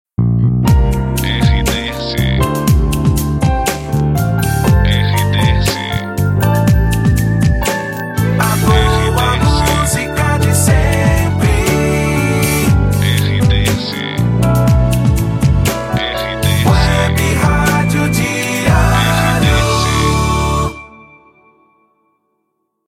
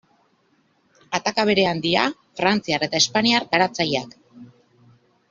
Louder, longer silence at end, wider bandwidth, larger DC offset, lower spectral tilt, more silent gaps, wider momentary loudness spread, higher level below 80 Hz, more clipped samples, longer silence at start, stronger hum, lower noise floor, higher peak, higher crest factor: first, -13 LUFS vs -20 LUFS; first, 2 s vs 0.85 s; first, 16.5 kHz vs 7.6 kHz; neither; first, -5.5 dB/octave vs -3.5 dB/octave; neither; about the same, 5 LU vs 7 LU; first, -20 dBFS vs -62 dBFS; neither; second, 0.2 s vs 1.1 s; neither; first, -68 dBFS vs -63 dBFS; about the same, 0 dBFS vs -2 dBFS; second, 12 dB vs 22 dB